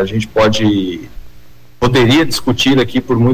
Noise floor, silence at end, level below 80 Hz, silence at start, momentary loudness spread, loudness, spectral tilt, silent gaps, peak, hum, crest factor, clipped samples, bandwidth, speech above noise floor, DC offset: -42 dBFS; 0 s; -36 dBFS; 0 s; 8 LU; -13 LUFS; -5.5 dB/octave; none; -4 dBFS; 60 Hz at -40 dBFS; 10 dB; under 0.1%; 16 kHz; 30 dB; under 0.1%